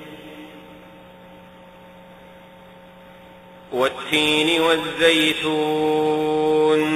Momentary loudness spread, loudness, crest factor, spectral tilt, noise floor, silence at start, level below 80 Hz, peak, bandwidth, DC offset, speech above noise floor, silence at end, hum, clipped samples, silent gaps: 22 LU; -19 LUFS; 20 dB; -4 dB/octave; -45 dBFS; 0 s; -58 dBFS; -2 dBFS; 15.5 kHz; under 0.1%; 26 dB; 0 s; none; under 0.1%; none